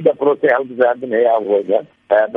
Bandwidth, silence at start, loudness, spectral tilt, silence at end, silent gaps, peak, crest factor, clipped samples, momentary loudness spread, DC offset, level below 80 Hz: 3.9 kHz; 0 s; -16 LUFS; -8 dB/octave; 0 s; none; 0 dBFS; 14 dB; under 0.1%; 3 LU; under 0.1%; -68 dBFS